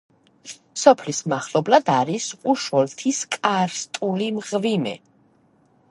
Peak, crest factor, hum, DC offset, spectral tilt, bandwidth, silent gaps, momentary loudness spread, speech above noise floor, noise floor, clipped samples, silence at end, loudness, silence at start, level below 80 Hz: 0 dBFS; 22 dB; none; under 0.1%; -4 dB/octave; 11.5 kHz; none; 10 LU; 38 dB; -59 dBFS; under 0.1%; 0.95 s; -21 LUFS; 0.45 s; -72 dBFS